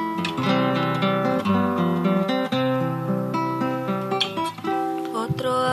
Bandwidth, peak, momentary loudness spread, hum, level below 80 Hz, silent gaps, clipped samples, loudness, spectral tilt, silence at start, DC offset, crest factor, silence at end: 13.5 kHz; -6 dBFS; 5 LU; none; -62 dBFS; none; under 0.1%; -23 LUFS; -6.5 dB/octave; 0 s; under 0.1%; 16 dB; 0 s